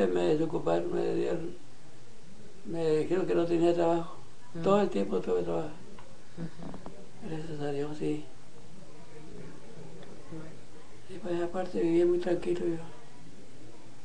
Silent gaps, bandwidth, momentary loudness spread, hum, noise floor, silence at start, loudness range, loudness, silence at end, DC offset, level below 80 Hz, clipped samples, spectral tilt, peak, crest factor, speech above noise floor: none; 10 kHz; 25 LU; none; -54 dBFS; 0 s; 11 LU; -30 LUFS; 0.1 s; 2%; -58 dBFS; under 0.1%; -7 dB/octave; -14 dBFS; 20 dB; 24 dB